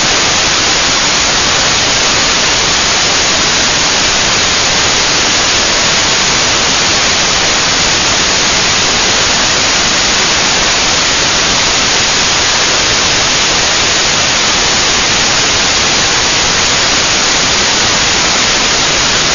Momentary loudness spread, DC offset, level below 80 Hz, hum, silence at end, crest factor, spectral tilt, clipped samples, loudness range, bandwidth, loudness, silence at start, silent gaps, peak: 0 LU; under 0.1%; -30 dBFS; none; 0 s; 10 dB; -0.5 dB/octave; under 0.1%; 0 LU; 12 kHz; -8 LUFS; 0 s; none; 0 dBFS